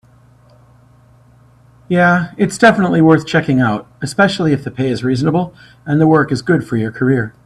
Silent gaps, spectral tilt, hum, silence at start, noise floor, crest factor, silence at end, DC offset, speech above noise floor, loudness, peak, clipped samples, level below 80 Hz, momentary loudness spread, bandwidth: none; -6.5 dB/octave; none; 1.9 s; -47 dBFS; 14 dB; 0.15 s; under 0.1%; 33 dB; -14 LUFS; 0 dBFS; under 0.1%; -48 dBFS; 8 LU; 12 kHz